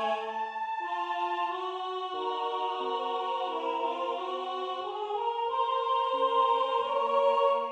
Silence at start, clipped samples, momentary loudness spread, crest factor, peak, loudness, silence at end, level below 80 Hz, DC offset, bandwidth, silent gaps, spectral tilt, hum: 0 s; under 0.1%; 8 LU; 16 dB; -14 dBFS; -30 LUFS; 0 s; -86 dBFS; under 0.1%; 9 kHz; none; -3 dB/octave; none